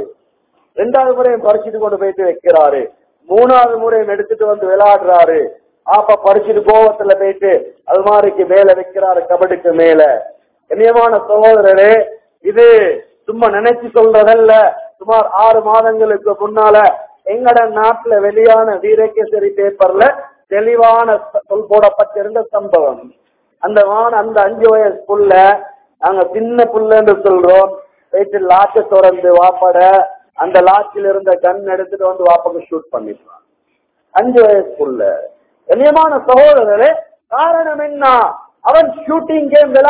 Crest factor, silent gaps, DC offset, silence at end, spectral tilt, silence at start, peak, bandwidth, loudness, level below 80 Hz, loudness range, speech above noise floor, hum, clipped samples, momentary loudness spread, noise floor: 10 dB; none; under 0.1%; 0 s; -8 dB/octave; 0 s; 0 dBFS; 4 kHz; -10 LUFS; -52 dBFS; 4 LU; 54 dB; none; 2%; 10 LU; -63 dBFS